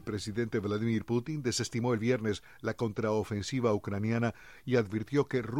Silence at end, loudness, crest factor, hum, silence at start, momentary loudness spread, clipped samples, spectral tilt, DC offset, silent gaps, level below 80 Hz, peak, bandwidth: 0 s; -32 LUFS; 16 dB; none; 0.05 s; 5 LU; under 0.1%; -6 dB/octave; 0.1%; none; -62 dBFS; -16 dBFS; 15.5 kHz